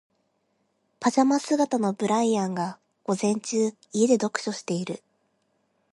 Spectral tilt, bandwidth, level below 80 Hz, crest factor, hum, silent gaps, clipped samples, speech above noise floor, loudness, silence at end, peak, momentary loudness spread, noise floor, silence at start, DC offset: -5 dB/octave; 11.5 kHz; -74 dBFS; 18 dB; none; none; under 0.1%; 48 dB; -25 LUFS; 0.95 s; -8 dBFS; 9 LU; -72 dBFS; 1 s; under 0.1%